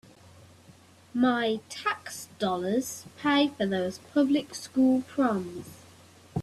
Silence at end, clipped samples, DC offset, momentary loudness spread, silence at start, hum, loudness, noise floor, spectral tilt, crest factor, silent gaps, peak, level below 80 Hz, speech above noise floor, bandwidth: 0 s; under 0.1%; under 0.1%; 13 LU; 1.15 s; none; -28 LUFS; -55 dBFS; -5 dB/octave; 18 dB; none; -10 dBFS; -68 dBFS; 28 dB; 13.5 kHz